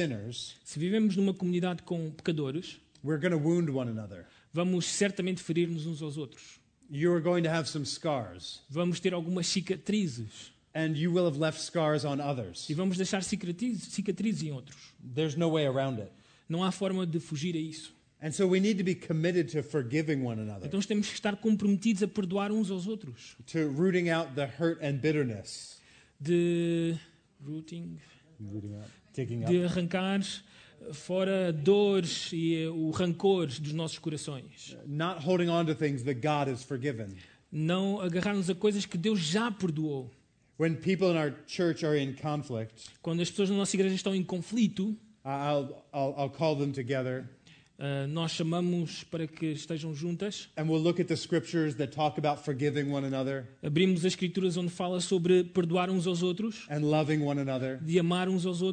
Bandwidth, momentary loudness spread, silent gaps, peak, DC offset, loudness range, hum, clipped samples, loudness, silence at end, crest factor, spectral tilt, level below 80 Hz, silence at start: 9.4 kHz; 13 LU; none; -14 dBFS; under 0.1%; 4 LU; none; under 0.1%; -31 LUFS; 0 s; 18 dB; -6 dB/octave; -68 dBFS; 0 s